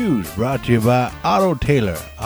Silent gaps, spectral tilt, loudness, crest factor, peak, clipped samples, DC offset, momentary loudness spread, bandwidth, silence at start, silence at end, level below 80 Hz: none; -6.5 dB/octave; -18 LUFS; 14 dB; -4 dBFS; under 0.1%; under 0.1%; 6 LU; over 20 kHz; 0 s; 0 s; -36 dBFS